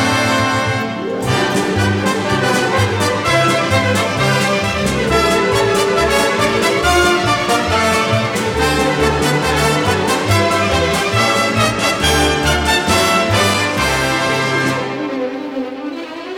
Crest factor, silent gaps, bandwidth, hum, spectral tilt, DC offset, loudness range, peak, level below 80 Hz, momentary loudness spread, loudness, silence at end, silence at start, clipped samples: 14 dB; none; 19 kHz; none; -4 dB/octave; under 0.1%; 2 LU; -2 dBFS; -34 dBFS; 5 LU; -14 LUFS; 0 s; 0 s; under 0.1%